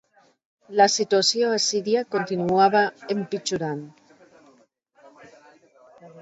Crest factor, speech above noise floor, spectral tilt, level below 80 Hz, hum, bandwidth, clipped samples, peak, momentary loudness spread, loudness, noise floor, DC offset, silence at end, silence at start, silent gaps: 20 dB; 38 dB; -3 dB/octave; -66 dBFS; none; 8 kHz; under 0.1%; -4 dBFS; 10 LU; -22 LUFS; -60 dBFS; under 0.1%; 0 s; 0.7 s; none